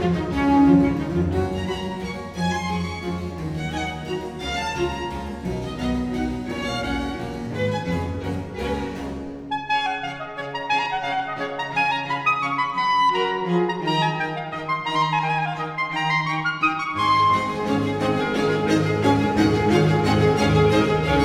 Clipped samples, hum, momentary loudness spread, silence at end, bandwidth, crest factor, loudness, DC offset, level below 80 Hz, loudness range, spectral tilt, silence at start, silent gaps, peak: under 0.1%; none; 11 LU; 0 s; 14 kHz; 16 dB; -22 LUFS; under 0.1%; -40 dBFS; 7 LU; -6 dB/octave; 0 s; none; -6 dBFS